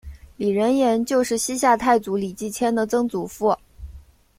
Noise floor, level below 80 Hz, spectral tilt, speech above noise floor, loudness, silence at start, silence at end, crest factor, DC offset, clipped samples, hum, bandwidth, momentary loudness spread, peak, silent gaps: -45 dBFS; -48 dBFS; -4.5 dB/octave; 24 dB; -21 LUFS; 0.05 s; 0.4 s; 18 dB; under 0.1%; under 0.1%; none; 16.5 kHz; 8 LU; -4 dBFS; none